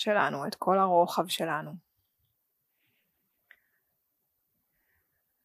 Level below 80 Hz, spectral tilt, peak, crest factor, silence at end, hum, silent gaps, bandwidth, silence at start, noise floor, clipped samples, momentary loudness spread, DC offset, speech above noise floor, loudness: -88 dBFS; -4.5 dB/octave; -10 dBFS; 22 dB; 3.65 s; none; none; 15.5 kHz; 0 s; -79 dBFS; under 0.1%; 10 LU; under 0.1%; 51 dB; -28 LUFS